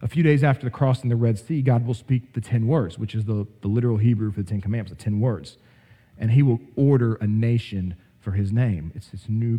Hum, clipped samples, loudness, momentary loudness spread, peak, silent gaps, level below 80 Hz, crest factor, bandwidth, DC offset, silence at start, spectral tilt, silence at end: none; under 0.1%; -23 LUFS; 10 LU; -6 dBFS; none; -52 dBFS; 16 dB; 9.8 kHz; under 0.1%; 0 s; -9 dB/octave; 0 s